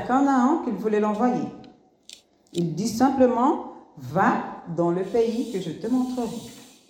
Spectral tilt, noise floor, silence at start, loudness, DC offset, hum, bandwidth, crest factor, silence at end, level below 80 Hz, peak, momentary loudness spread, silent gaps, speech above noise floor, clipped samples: -6.5 dB/octave; -50 dBFS; 0 s; -24 LUFS; under 0.1%; none; 16 kHz; 18 dB; 0.25 s; -62 dBFS; -6 dBFS; 13 LU; none; 27 dB; under 0.1%